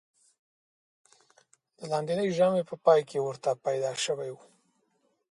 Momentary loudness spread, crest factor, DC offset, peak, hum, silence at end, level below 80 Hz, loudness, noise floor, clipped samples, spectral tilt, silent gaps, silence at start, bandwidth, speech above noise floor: 12 LU; 22 dB; under 0.1%; -8 dBFS; none; 0.95 s; -78 dBFS; -28 LUFS; -73 dBFS; under 0.1%; -4.5 dB/octave; none; 1.8 s; 11.5 kHz; 46 dB